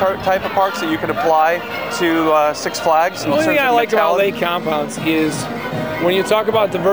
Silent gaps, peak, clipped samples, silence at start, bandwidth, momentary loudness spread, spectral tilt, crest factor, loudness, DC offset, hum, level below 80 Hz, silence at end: none; -2 dBFS; under 0.1%; 0 s; over 20 kHz; 6 LU; -4.5 dB/octave; 14 dB; -16 LUFS; 0.3%; none; -50 dBFS; 0 s